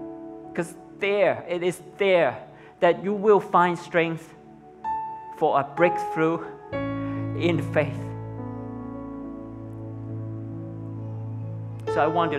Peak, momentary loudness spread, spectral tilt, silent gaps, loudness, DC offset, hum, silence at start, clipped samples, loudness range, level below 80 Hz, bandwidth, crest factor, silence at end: -4 dBFS; 15 LU; -7 dB/octave; none; -26 LUFS; under 0.1%; none; 0 s; under 0.1%; 12 LU; -56 dBFS; 13 kHz; 20 dB; 0 s